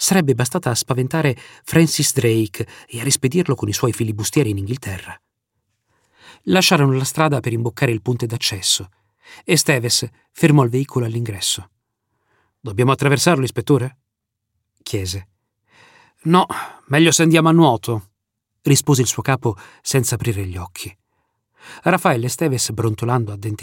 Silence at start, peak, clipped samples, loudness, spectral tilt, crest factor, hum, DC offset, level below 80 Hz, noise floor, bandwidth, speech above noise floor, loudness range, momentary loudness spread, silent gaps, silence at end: 0 s; -2 dBFS; under 0.1%; -18 LUFS; -4.5 dB/octave; 18 dB; none; under 0.1%; -54 dBFS; -79 dBFS; 17 kHz; 61 dB; 5 LU; 14 LU; none; 0 s